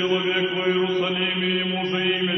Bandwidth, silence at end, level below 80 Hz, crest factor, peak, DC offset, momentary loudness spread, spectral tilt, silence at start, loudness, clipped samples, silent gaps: 6.2 kHz; 0 s; -64 dBFS; 14 dB; -10 dBFS; under 0.1%; 1 LU; -6 dB/octave; 0 s; -22 LUFS; under 0.1%; none